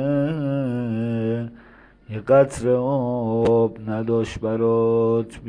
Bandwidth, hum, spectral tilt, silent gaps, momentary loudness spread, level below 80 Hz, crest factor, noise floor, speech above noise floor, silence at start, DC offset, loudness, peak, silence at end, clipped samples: 10 kHz; none; -8 dB/octave; none; 9 LU; -50 dBFS; 16 dB; -49 dBFS; 29 dB; 0 s; under 0.1%; -21 LUFS; -6 dBFS; 0 s; under 0.1%